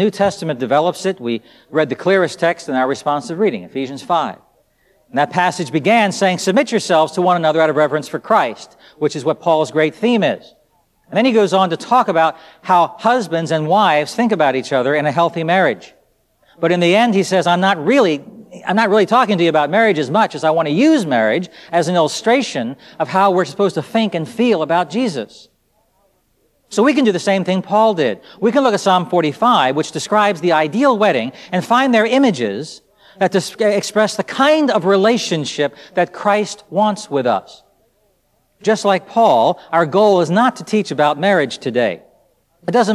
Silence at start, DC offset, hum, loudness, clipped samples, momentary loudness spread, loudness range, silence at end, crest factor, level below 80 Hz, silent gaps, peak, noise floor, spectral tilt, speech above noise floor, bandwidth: 0 s; under 0.1%; none; -16 LUFS; under 0.1%; 8 LU; 4 LU; 0 s; 14 dB; -64 dBFS; none; 0 dBFS; -61 dBFS; -5 dB/octave; 46 dB; 14 kHz